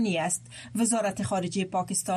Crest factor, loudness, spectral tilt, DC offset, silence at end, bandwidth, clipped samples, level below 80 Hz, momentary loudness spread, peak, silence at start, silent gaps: 14 dB; -28 LUFS; -4 dB/octave; under 0.1%; 0 s; 14 kHz; under 0.1%; -64 dBFS; 5 LU; -14 dBFS; 0 s; none